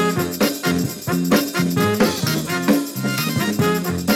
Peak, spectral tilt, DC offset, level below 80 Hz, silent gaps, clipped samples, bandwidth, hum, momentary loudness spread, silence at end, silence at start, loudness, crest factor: -4 dBFS; -5 dB/octave; under 0.1%; -50 dBFS; none; under 0.1%; 18 kHz; none; 4 LU; 0 s; 0 s; -19 LUFS; 14 dB